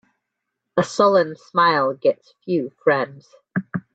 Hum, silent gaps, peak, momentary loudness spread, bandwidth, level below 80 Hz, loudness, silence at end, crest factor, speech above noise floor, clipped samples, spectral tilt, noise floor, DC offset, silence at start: none; none; -4 dBFS; 13 LU; 8.8 kHz; -68 dBFS; -20 LUFS; 0.15 s; 18 dB; 60 dB; under 0.1%; -5.5 dB/octave; -80 dBFS; under 0.1%; 0.75 s